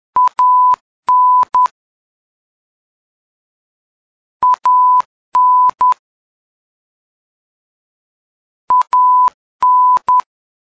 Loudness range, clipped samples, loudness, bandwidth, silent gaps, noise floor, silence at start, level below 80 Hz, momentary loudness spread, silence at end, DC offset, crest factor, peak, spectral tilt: 6 LU; under 0.1%; -12 LUFS; 8 kHz; 0.81-1.03 s, 1.71-4.40 s, 5.05-5.32 s, 5.99-8.68 s, 9.34-9.59 s; under -90 dBFS; 0.15 s; -62 dBFS; 7 LU; 0.4 s; under 0.1%; 10 dB; -6 dBFS; -2.5 dB/octave